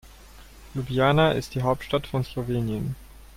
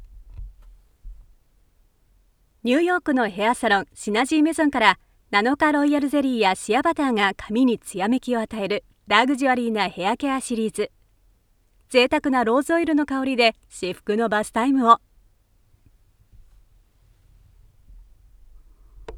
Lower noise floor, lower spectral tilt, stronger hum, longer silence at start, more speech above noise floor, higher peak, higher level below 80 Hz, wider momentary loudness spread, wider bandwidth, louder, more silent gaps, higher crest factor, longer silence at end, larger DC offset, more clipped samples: second, -47 dBFS vs -61 dBFS; first, -6.5 dB/octave vs -4 dB/octave; neither; about the same, 0.05 s vs 0 s; second, 23 dB vs 40 dB; second, -8 dBFS vs 0 dBFS; first, -44 dBFS vs -50 dBFS; first, 14 LU vs 7 LU; first, 16 kHz vs 14.5 kHz; second, -25 LUFS vs -21 LUFS; neither; about the same, 18 dB vs 22 dB; about the same, 0.1 s vs 0 s; neither; neither